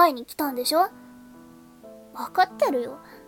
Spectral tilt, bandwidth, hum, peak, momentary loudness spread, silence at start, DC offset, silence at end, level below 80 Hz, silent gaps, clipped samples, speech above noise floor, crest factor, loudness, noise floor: -2.5 dB/octave; 18 kHz; none; -6 dBFS; 14 LU; 0 s; under 0.1%; 0.1 s; -68 dBFS; none; under 0.1%; 24 dB; 18 dB; -25 LUFS; -49 dBFS